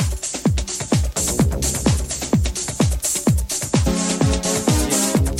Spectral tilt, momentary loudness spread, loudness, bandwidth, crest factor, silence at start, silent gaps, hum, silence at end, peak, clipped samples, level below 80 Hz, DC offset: -4.5 dB/octave; 4 LU; -19 LUFS; 16.5 kHz; 14 dB; 0 s; none; none; 0 s; -4 dBFS; under 0.1%; -26 dBFS; under 0.1%